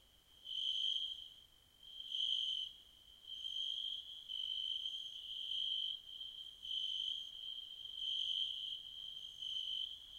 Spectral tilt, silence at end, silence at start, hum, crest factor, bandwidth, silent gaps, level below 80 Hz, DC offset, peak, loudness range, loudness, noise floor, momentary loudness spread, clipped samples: 1 dB/octave; 0 s; 0.15 s; none; 18 dB; 16 kHz; none; -76 dBFS; under 0.1%; -26 dBFS; 1 LU; -41 LUFS; -65 dBFS; 13 LU; under 0.1%